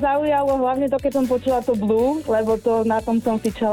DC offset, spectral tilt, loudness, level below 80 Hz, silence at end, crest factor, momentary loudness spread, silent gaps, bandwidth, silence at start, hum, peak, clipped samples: under 0.1%; -6.5 dB/octave; -20 LUFS; -44 dBFS; 0 s; 12 dB; 2 LU; none; 17.5 kHz; 0 s; none; -8 dBFS; under 0.1%